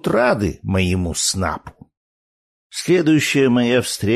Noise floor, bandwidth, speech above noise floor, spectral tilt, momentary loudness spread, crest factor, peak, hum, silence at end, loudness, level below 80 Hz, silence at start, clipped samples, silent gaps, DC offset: under -90 dBFS; 13.5 kHz; over 73 dB; -4.5 dB/octave; 10 LU; 14 dB; -4 dBFS; none; 0 s; -18 LUFS; -42 dBFS; 0.05 s; under 0.1%; 1.97-2.70 s; under 0.1%